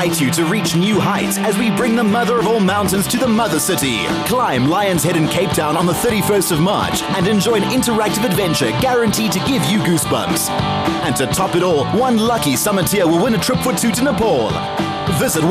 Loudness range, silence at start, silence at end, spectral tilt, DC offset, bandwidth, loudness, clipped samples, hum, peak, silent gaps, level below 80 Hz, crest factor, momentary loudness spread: 1 LU; 0 s; 0 s; -4.5 dB/octave; under 0.1%; 16 kHz; -16 LUFS; under 0.1%; none; -4 dBFS; none; -42 dBFS; 12 dB; 3 LU